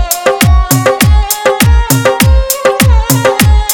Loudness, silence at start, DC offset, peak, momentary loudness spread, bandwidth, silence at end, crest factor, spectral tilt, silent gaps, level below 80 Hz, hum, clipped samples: -9 LUFS; 0 s; under 0.1%; 0 dBFS; 2 LU; over 20 kHz; 0 s; 8 dB; -4.5 dB/octave; none; -12 dBFS; none; 0.6%